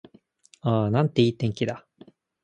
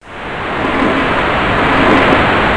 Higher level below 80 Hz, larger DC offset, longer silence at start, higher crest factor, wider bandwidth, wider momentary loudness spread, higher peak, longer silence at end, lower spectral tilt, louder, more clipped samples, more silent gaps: second, -58 dBFS vs -28 dBFS; neither; first, 0.65 s vs 0.05 s; first, 20 dB vs 12 dB; second, 9.2 kHz vs 10.5 kHz; about the same, 9 LU vs 10 LU; second, -6 dBFS vs 0 dBFS; first, 0.65 s vs 0 s; first, -7.5 dB/octave vs -6 dB/octave; second, -25 LUFS vs -12 LUFS; neither; neither